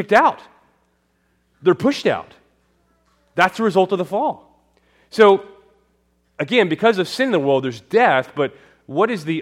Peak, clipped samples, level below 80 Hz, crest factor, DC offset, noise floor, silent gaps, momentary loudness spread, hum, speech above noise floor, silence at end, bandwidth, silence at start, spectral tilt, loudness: 0 dBFS; under 0.1%; -64 dBFS; 18 dB; under 0.1%; -64 dBFS; none; 12 LU; none; 47 dB; 0 s; 14.5 kHz; 0 s; -5.5 dB/octave; -18 LUFS